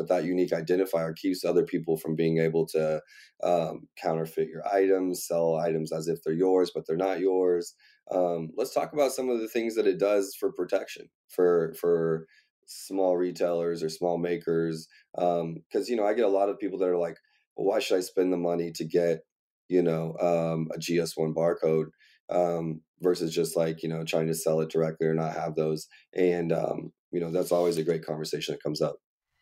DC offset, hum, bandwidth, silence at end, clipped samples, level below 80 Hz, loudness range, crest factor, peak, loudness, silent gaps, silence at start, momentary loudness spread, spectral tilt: under 0.1%; none; 16 kHz; 0.45 s; under 0.1%; -70 dBFS; 1 LU; 16 dB; -12 dBFS; -28 LUFS; 11.15-11.28 s, 12.50-12.62 s, 15.66-15.70 s, 17.47-17.56 s, 19.32-19.69 s, 22.20-22.28 s, 22.88-22.94 s, 26.99-27.12 s; 0 s; 8 LU; -6 dB/octave